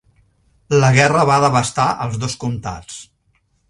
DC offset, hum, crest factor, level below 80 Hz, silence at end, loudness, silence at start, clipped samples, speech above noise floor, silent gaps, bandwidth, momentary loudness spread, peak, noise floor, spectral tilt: under 0.1%; none; 18 dB; -46 dBFS; 0.65 s; -16 LUFS; 0.7 s; under 0.1%; 47 dB; none; 11.5 kHz; 18 LU; 0 dBFS; -62 dBFS; -5 dB/octave